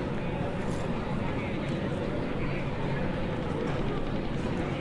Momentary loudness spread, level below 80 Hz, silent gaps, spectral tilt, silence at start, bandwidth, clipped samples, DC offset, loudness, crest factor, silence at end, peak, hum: 1 LU; -40 dBFS; none; -7.5 dB/octave; 0 s; 11 kHz; under 0.1%; under 0.1%; -32 LUFS; 14 dB; 0 s; -18 dBFS; none